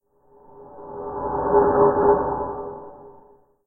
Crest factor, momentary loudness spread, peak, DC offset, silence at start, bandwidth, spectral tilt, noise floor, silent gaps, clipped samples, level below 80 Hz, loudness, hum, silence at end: 18 dB; 22 LU; -6 dBFS; under 0.1%; 0.55 s; 1.9 kHz; -14 dB/octave; -53 dBFS; none; under 0.1%; -46 dBFS; -20 LUFS; none; 0.55 s